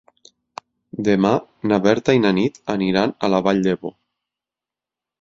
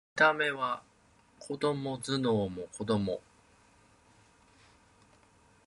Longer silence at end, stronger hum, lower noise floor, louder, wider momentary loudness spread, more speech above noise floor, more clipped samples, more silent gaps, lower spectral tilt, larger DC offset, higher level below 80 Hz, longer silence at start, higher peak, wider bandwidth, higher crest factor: second, 1.3 s vs 2.45 s; first, 50 Hz at -55 dBFS vs none; first, -88 dBFS vs -64 dBFS; first, -19 LUFS vs -31 LUFS; first, 21 LU vs 15 LU; first, 70 dB vs 33 dB; neither; neither; first, -6.5 dB/octave vs -5 dB/octave; neither; first, -54 dBFS vs -64 dBFS; first, 0.95 s vs 0.15 s; first, -2 dBFS vs -10 dBFS; second, 7.6 kHz vs 11.5 kHz; about the same, 20 dB vs 24 dB